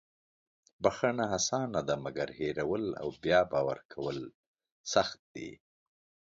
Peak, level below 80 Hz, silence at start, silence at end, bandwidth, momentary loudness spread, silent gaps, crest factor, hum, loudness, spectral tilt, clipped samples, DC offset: -10 dBFS; -62 dBFS; 0.8 s; 0.75 s; 7.8 kHz; 16 LU; 3.85-3.89 s, 4.35-4.54 s, 4.72-4.84 s, 5.19-5.35 s; 24 dB; none; -32 LUFS; -4 dB/octave; under 0.1%; under 0.1%